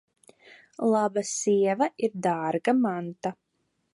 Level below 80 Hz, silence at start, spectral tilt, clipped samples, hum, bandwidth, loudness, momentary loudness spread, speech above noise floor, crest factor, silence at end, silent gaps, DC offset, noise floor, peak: -76 dBFS; 0.8 s; -5 dB/octave; under 0.1%; none; 11.5 kHz; -26 LUFS; 9 LU; 50 dB; 18 dB; 0.6 s; none; under 0.1%; -75 dBFS; -10 dBFS